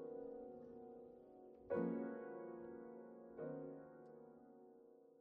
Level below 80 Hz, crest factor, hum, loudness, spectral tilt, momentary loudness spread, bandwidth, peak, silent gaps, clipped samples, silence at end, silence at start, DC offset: -84 dBFS; 22 dB; none; -51 LUFS; -9 dB/octave; 20 LU; 3.6 kHz; -30 dBFS; none; under 0.1%; 0 s; 0 s; under 0.1%